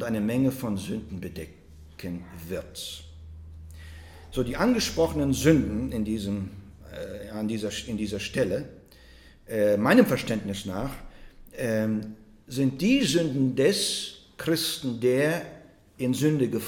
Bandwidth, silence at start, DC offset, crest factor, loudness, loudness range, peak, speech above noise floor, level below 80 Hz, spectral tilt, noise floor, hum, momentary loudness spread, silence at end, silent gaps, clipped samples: 18 kHz; 0 s; under 0.1%; 22 dB; -27 LUFS; 8 LU; -4 dBFS; 26 dB; -48 dBFS; -5 dB/octave; -52 dBFS; none; 22 LU; 0 s; none; under 0.1%